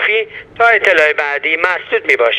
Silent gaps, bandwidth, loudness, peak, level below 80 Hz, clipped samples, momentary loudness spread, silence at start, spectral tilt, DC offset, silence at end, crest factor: none; 11.5 kHz; -12 LUFS; 0 dBFS; -56 dBFS; under 0.1%; 7 LU; 0 s; -2.5 dB/octave; under 0.1%; 0 s; 14 dB